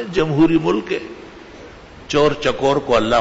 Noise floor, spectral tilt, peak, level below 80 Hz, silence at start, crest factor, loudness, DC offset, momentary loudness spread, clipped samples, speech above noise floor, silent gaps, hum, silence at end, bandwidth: -39 dBFS; -6 dB/octave; -4 dBFS; -40 dBFS; 0 s; 14 dB; -17 LUFS; under 0.1%; 23 LU; under 0.1%; 22 dB; none; none; 0 s; 8 kHz